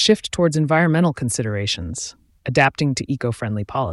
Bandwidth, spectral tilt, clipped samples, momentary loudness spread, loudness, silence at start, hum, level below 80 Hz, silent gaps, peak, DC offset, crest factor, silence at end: 12 kHz; -5 dB/octave; under 0.1%; 10 LU; -20 LUFS; 0 s; none; -46 dBFS; none; -4 dBFS; under 0.1%; 16 dB; 0 s